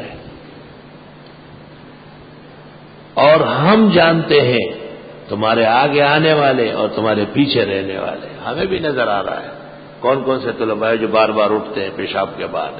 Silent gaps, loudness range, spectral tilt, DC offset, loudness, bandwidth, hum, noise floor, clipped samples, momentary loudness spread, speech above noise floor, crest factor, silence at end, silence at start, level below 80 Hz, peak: none; 6 LU; -11 dB/octave; under 0.1%; -15 LUFS; 5 kHz; none; -39 dBFS; under 0.1%; 15 LU; 24 dB; 16 dB; 0 s; 0 s; -50 dBFS; 0 dBFS